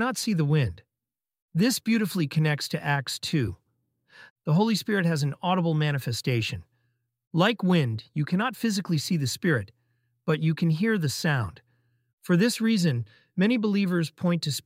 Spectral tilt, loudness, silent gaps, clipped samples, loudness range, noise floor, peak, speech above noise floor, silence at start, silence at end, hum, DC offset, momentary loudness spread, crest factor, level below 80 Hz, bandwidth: -5.5 dB/octave; -26 LUFS; 1.42-1.48 s, 4.30-4.36 s, 7.27-7.31 s, 12.13-12.18 s; under 0.1%; 1 LU; -90 dBFS; -6 dBFS; 65 dB; 0 s; 0.05 s; none; under 0.1%; 8 LU; 20 dB; -60 dBFS; 16 kHz